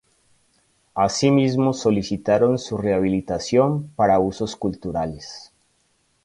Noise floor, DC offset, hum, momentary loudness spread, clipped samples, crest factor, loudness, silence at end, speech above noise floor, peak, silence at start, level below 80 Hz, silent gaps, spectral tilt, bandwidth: -66 dBFS; under 0.1%; none; 10 LU; under 0.1%; 16 dB; -21 LUFS; 0.8 s; 45 dB; -6 dBFS; 0.95 s; -50 dBFS; none; -6 dB/octave; 11.5 kHz